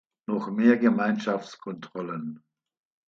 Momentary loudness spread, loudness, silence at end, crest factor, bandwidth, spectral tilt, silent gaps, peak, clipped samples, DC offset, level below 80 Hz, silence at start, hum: 17 LU; -26 LUFS; 0.7 s; 20 dB; 7.2 kHz; -7 dB/octave; none; -6 dBFS; under 0.1%; under 0.1%; -76 dBFS; 0.3 s; none